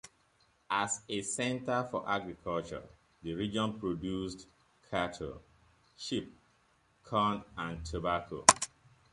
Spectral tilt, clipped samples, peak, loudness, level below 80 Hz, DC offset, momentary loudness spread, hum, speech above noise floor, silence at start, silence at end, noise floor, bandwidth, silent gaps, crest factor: -3 dB/octave; under 0.1%; -2 dBFS; -33 LUFS; -58 dBFS; under 0.1%; 16 LU; none; 36 dB; 0.05 s; 0.45 s; -70 dBFS; 11.5 kHz; none; 34 dB